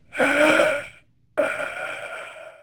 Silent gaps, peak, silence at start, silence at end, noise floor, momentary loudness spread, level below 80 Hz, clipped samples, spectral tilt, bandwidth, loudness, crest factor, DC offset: none; -4 dBFS; 0.15 s; 0.1 s; -51 dBFS; 19 LU; -60 dBFS; under 0.1%; -3 dB/octave; 19.5 kHz; -22 LUFS; 18 dB; under 0.1%